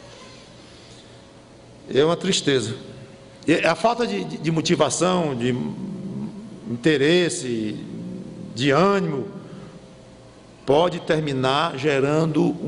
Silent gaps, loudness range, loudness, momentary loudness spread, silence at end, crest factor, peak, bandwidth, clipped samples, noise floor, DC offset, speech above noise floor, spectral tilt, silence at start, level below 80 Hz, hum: none; 3 LU; -21 LUFS; 17 LU; 0 s; 18 dB; -6 dBFS; 11 kHz; under 0.1%; -46 dBFS; under 0.1%; 26 dB; -5 dB/octave; 0 s; -56 dBFS; none